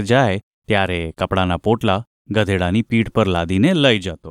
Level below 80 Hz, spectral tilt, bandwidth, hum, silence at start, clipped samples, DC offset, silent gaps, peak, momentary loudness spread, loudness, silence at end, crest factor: -42 dBFS; -6.5 dB/octave; 13.5 kHz; none; 0 s; under 0.1%; under 0.1%; 0.43-0.62 s, 2.07-2.25 s; -2 dBFS; 7 LU; -18 LUFS; 0 s; 16 dB